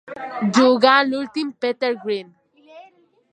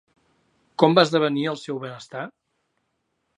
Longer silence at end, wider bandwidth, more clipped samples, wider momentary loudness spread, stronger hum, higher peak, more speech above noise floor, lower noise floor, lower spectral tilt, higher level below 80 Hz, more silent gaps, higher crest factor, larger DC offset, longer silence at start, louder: second, 0.5 s vs 1.1 s; second, 9.4 kHz vs 10.5 kHz; neither; second, 13 LU vs 18 LU; neither; about the same, 0 dBFS vs -2 dBFS; second, 35 dB vs 53 dB; second, -53 dBFS vs -74 dBFS; second, -4.5 dB/octave vs -6 dB/octave; about the same, -72 dBFS vs -76 dBFS; neither; about the same, 20 dB vs 22 dB; neither; second, 0.05 s vs 0.8 s; about the same, -19 LUFS vs -21 LUFS